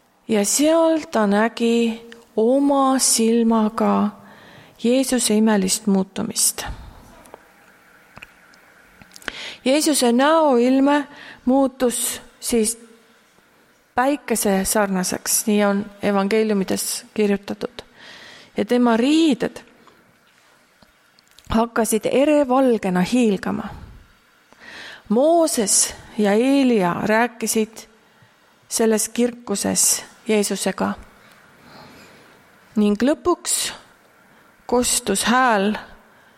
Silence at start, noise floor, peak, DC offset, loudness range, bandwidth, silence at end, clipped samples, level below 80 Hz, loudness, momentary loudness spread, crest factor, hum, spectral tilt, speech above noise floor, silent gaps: 0.3 s; -56 dBFS; -2 dBFS; under 0.1%; 5 LU; 16.5 kHz; 0.4 s; under 0.1%; -50 dBFS; -19 LUFS; 13 LU; 18 dB; none; -3.5 dB/octave; 38 dB; none